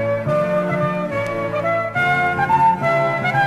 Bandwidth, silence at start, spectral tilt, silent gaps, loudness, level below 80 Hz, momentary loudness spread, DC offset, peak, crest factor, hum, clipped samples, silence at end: 14 kHz; 0 s; -7 dB/octave; none; -18 LUFS; -48 dBFS; 7 LU; under 0.1%; -6 dBFS; 14 dB; none; under 0.1%; 0 s